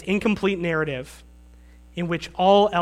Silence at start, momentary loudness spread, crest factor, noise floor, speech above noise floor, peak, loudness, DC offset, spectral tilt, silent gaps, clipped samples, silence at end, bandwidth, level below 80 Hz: 0 s; 17 LU; 18 dB; -48 dBFS; 26 dB; -6 dBFS; -22 LUFS; under 0.1%; -6 dB/octave; none; under 0.1%; 0 s; 13.5 kHz; -48 dBFS